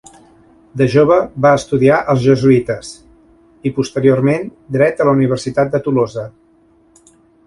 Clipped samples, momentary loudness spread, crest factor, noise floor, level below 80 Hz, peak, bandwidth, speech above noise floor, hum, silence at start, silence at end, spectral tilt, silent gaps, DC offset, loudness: under 0.1%; 12 LU; 14 dB; -51 dBFS; -48 dBFS; 0 dBFS; 11.5 kHz; 38 dB; none; 0.75 s; 1.15 s; -7 dB/octave; none; under 0.1%; -14 LUFS